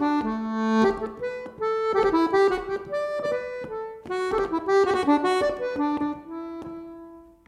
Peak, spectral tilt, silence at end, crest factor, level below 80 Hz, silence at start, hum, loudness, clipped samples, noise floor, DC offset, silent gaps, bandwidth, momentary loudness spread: -8 dBFS; -5.5 dB/octave; 0.25 s; 16 dB; -54 dBFS; 0 s; none; -25 LUFS; under 0.1%; -46 dBFS; under 0.1%; none; 11 kHz; 14 LU